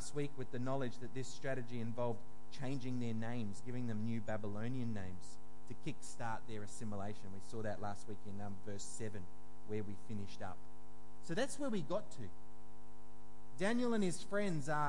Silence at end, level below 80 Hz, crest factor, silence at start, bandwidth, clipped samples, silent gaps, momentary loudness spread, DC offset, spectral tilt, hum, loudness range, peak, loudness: 0 s; -70 dBFS; 18 dB; 0 s; 11.5 kHz; under 0.1%; none; 20 LU; 2%; -5.5 dB/octave; none; 6 LU; -24 dBFS; -44 LUFS